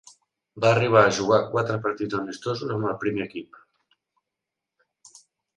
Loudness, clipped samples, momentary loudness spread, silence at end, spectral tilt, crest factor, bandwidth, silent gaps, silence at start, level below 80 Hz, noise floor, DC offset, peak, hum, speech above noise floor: -23 LUFS; under 0.1%; 12 LU; 2.1 s; -5.5 dB/octave; 22 dB; 11 kHz; none; 0.55 s; -62 dBFS; -86 dBFS; under 0.1%; -2 dBFS; none; 63 dB